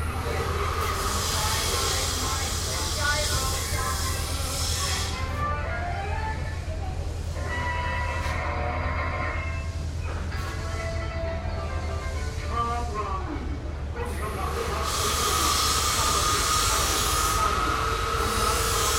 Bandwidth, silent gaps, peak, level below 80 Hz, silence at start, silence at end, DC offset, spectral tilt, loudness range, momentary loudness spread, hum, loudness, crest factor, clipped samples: 16.5 kHz; none; -10 dBFS; -34 dBFS; 0 s; 0 s; under 0.1%; -3 dB/octave; 8 LU; 10 LU; none; -26 LUFS; 16 dB; under 0.1%